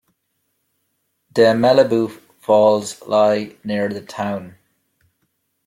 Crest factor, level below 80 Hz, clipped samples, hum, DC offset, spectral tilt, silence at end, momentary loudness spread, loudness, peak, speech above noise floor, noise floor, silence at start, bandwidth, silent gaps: 18 dB; -62 dBFS; under 0.1%; none; under 0.1%; -5.5 dB/octave; 1.15 s; 12 LU; -17 LUFS; -2 dBFS; 54 dB; -71 dBFS; 1.35 s; 15.5 kHz; none